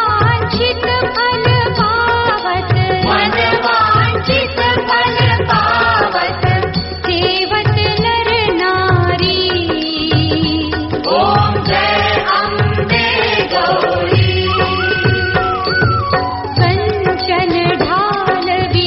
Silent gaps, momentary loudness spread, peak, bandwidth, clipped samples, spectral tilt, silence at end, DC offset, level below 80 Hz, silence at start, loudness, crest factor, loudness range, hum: none; 3 LU; 0 dBFS; 6 kHz; under 0.1%; -3 dB/octave; 0 s; under 0.1%; -34 dBFS; 0 s; -13 LUFS; 14 dB; 1 LU; none